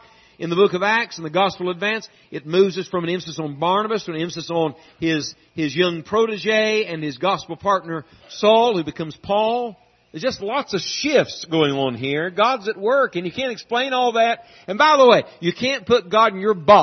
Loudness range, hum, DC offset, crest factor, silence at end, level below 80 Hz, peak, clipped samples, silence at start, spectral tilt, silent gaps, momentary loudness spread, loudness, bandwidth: 4 LU; none; under 0.1%; 20 dB; 0 s; -62 dBFS; 0 dBFS; under 0.1%; 0.4 s; -4.5 dB/octave; none; 11 LU; -20 LUFS; 6.4 kHz